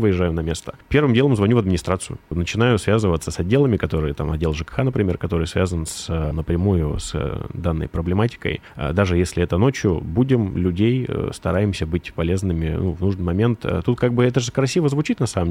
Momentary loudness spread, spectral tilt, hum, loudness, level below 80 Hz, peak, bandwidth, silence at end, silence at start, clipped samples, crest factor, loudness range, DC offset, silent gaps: 8 LU; -6.5 dB/octave; none; -21 LUFS; -38 dBFS; -4 dBFS; 15 kHz; 0 s; 0 s; under 0.1%; 16 dB; 3 LU; under 0.1%; none